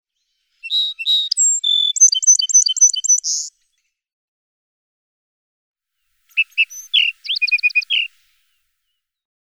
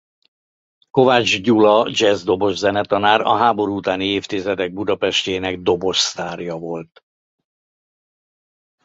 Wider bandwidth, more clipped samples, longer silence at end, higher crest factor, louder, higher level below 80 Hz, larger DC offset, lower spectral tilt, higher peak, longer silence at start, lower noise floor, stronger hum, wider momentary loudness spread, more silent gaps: first, 19.5 kHz vs 8 kHz; neither; second, 1.35 s vs 2 s; about the same, 18 dB vs 18 dB; first, -13 LUFS vs -17 LUFS; second, -82 dBFS vs -52 dBFS; neither; second, 13.5 dB/octave vs -4 dB/octave; about the same, -2 dBFS vs 0 dBFS; second, 0.65 s vs 0.95 s; second, -75 dBFS vs under -90 dBFS; neither; about the same, 11 LU vs 12 LU; first, 4.13-5.74 s vs none